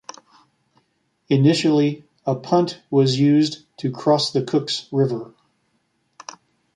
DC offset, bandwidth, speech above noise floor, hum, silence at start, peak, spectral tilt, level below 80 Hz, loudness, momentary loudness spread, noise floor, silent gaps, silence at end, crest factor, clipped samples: under 0.1%; 10.5 kHz; 49 dB; none; 1.3 s; -4 dBFS; -6.5 dB/octave; -66 dBFS; -20 LUFS; 23 LU; -68 dBFS; none; 1.5 s; 18 dB; under 0.1%